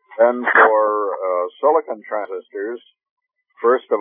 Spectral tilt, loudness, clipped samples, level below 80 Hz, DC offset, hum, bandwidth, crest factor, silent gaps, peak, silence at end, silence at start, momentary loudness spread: -7.5 dB/octave; -18 LUFS; under 0.1%; under -90 dBFS; under 0.1%; none; 3.7 kHz; 18 dB; 3.11-3.17 s; 0 dBFS; 0 s; 0.15 s; 15 LU